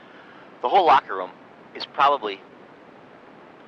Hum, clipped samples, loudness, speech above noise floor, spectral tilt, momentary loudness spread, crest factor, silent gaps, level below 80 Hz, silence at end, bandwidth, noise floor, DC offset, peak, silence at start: none; under 0.1%; -21 LUFS; 27 dB; -4.5 dB/octave; 20 LU; 18 dB; none; -68 dBFS; 1.3 s; 7.4 kHz; -47 dBFS; under 0.1%; -8 dBFS; 0.65 s